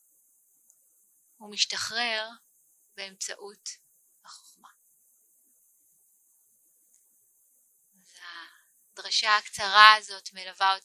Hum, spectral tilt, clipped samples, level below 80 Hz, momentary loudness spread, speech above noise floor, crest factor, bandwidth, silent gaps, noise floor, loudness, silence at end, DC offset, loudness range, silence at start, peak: none; 1.5 dB/octave; under 0.1%; -78 dBFS; 27 LU; 40 dB; 30 dB; 15.5 kHz; none; -66 dBFS; -23 LUFS; 0.05 s; under 0.1%; 22 LU; 1.4 s; 0 dBFS